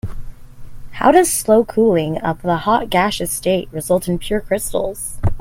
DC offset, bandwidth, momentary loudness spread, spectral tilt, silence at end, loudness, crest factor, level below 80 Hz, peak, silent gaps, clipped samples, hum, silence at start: under 0.1%; 16.5 kHz; 9 LU; -4.5 dB/octave; 0 s; -17 LUFS; 18 dB; -34 dBFS; 0 dBFS; none; under 0.1%; none; 0.05 s